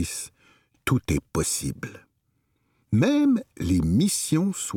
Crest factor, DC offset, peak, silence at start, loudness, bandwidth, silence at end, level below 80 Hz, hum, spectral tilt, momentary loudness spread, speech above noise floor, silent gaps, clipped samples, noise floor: 16 dB; under 0.1%; -8 dBFS; 0 s; -24 LUFS; 18.5 kHz; 0 s; -44 dBFS; none; -5 dB/octave; 13 LU; 48 dB; none; under 0.1%; -72 dBFS